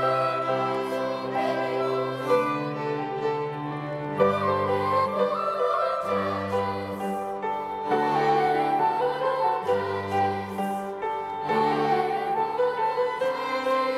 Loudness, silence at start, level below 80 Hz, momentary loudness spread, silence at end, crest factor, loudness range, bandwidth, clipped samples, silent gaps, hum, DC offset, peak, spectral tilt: -26 LUFS; 0 s; -66 dBFS; 7 LU; 0 s; 16 dB; 2 LU; 14.5 kHz; under 0.1%; none; none; under 0.1%; -8 dBFS; -6 dB/octave